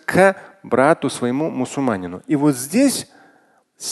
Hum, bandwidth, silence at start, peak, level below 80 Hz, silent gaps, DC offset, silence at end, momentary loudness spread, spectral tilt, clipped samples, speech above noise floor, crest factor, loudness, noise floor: none; 12.5 kHz; 0.1 s; 0 dBFS; -56 dBFS; none; under 0.1%; 0 s; 10 LU; -5 dB/octave; under 0.1%; 39 dB; 18 dB; -19 LUFS; -57 dBFS